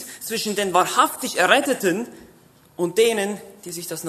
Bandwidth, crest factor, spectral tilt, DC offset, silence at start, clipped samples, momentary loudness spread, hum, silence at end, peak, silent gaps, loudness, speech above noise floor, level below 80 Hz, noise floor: 14 kHz; 22 dB; -2.5 dB/octave; under 0.1%; 0 s; under 0.1%; 15 LU; none; 0 s; 0 dBFS; none; -20 LUFS; 31 dB; -66 dBFS; -52 dBFS